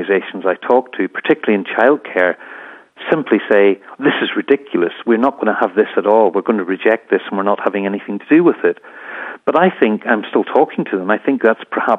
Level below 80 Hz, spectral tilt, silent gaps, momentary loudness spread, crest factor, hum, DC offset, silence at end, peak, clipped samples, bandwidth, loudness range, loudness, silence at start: -68 dBFS; -8 dB/octave; none; 8 LU; 16 dB; none; under 0.1%; 0 s; 0 dBFS; under 0.1%; 4 kHz; 1 LU; -15 LUFS; 0 s